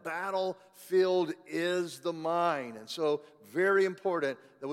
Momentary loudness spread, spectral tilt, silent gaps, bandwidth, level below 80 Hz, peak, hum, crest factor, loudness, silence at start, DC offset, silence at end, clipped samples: 10 LU; -5 dB/octave; none; 15.5 kHz; -88 dBFS; -16 dBFS; none; 16 dB; -31 LUFS; 0.05 s; under 0.1%; 0 s; under 0.1%